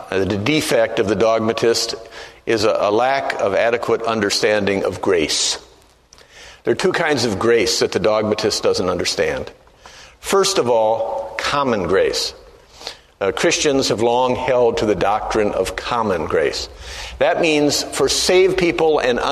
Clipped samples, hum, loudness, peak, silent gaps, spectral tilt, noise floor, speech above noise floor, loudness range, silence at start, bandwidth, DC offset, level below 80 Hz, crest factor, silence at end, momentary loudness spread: under 0.1%; none; -17 LUFS; -2 dBFS; none; -3.5 dB/octave; -49 dBFS; 32 dB; 2 LU; 0 s; 13.5 kHz; under 0.1%; -44 dBFS; 16 dB; 0 s; 8 LU